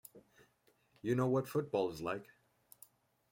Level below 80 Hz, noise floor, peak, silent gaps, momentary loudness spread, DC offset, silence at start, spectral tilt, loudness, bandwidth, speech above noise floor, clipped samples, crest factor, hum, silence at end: -74 dBFS; -74 dBFS; -22 dBFS; none; 25 LU; under 0.1%; 0.15 s; -7 dB/octave; -37 LUFS; 16.5 kHz; 38 dB; under 0.1%; 18 dB; none; 1.1 s